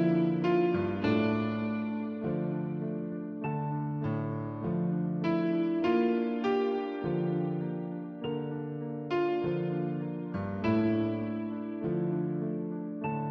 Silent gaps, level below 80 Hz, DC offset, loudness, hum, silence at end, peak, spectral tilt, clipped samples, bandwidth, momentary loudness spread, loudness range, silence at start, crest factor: none; -64 dBFS; under 0.1%; -32 LUFS; none; 0 s; -16 dBFS; -9.5 dB/octave; under 0.1%; 6.2 kHz; 8 LU; 3 LU; 0 s; 14 dB